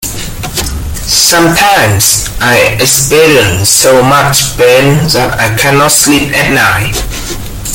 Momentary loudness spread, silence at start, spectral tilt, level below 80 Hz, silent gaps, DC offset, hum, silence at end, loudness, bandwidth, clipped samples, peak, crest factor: 12 LU; 0 s; -3 dB/octave; -24 dBFS; none; under 0.1%; none; 0 s; -6 LUFS; over 20 kHz; 1%; 0 dBFS; 8 dB